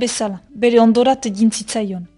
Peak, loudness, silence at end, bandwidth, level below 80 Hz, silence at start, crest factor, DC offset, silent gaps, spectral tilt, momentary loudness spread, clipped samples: -2 dBFS; -16 LUFS; 0.1 s; 11.5 kHz; -54 dBFS; 0 s; 14 dB; under 0.1%; none; -4.5 dB/octave; 10 LU; under 0.1%